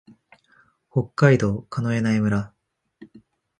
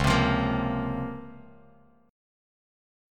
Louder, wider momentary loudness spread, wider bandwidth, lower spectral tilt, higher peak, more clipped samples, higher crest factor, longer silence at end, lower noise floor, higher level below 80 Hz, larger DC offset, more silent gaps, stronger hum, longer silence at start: first, -22 LUFS vs -27 LUFS; second, 10 LU vs 18 LU; second, 9.8 kHz vs 15.5 kHz; first, -7.5 dB/octave vs -6 dB/octave; first, -2 dBFS vs -10 dBFS; neither; about the same, 22 dB vs 20 dB; second, 0.55 s vs 1 s; about the same, -60 dBFS vs -58 dBFS; second, -52 dBFS vs -42 dBFS; neither; neither; neither; first, 0.95 s vs 0 s